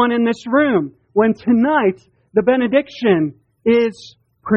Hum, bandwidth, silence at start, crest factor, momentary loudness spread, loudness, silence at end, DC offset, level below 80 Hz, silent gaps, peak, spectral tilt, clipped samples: none; 8 kHz; 0 s; 16 dB; 7 LU; -17 LUFS; 0 s; under 0.1%; -56 dBFS; none; -2 dBFS; -7 dB/octave; under 0.1%